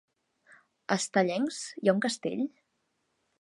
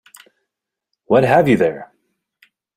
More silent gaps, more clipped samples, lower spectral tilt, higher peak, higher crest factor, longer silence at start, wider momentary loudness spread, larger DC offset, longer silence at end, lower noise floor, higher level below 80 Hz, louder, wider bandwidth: neither; neither; second, -4.5 dB/octave vs -7.5 dB/octave; second, -8 dBFS vs -2 dBFS; first, 24 dB vs 18 dB; second, 0.9 s vs 1.1 s; about the same, 8 LU vs 9 LU; neither; about the same, 0.95 s vs 0.9 s; about the same, -78 dBFS vs -81 dBFS; second, -82 dBFS vs -54 dBFS; second, -30 LUFS vs -15 LUFS; second, 11.5 kHz vs 15.5 kHz